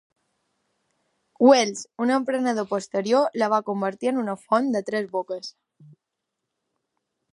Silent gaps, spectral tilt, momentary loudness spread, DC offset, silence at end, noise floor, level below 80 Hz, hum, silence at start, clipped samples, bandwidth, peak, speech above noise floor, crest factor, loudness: none; -4.5 dB/octave; 11 LU; under 0.1%; 1.85 s; -82 dBFS; -78 dBFS; none; 1.4 s; under 0.1%; 11.5 kHz; -4 dBFS; 60 dB; 22 dB; -23 LUFS